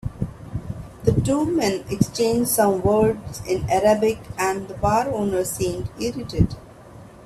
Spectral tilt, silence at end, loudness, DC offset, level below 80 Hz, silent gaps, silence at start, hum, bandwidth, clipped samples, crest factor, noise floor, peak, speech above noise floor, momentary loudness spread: -5.5 dB/octave; 0 s; -22 LUFS; under 0.1%; -40 dBFS; none; 0.05 s; none; 15.5 kHz; under 0.1%; 20 dB; -43 dBFS; -2 dBFS; 22 dB; 12 LU